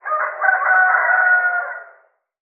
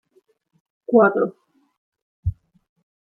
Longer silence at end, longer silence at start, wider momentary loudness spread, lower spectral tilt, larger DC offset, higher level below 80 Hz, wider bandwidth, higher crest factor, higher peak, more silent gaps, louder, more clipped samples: about the same, 0.65 s vs 0.7 s; second, 0.05 s vs 0.9 s; about the same, 12 LU vs 14 LU; second, 4.5 dB/octave vs -12 dB/octave; neither; second, under -90 dBFS vs -44 dBFS; second, 2.8 kHz vs 4 kHz; second, 16 dB vs 22 dB; about the same, -2 dBFS vs -2 dBFS; second, none vs 1.77-1.92 s, 2.02-2.23 s; first, -15 LUFS vs -20 LUFS; neither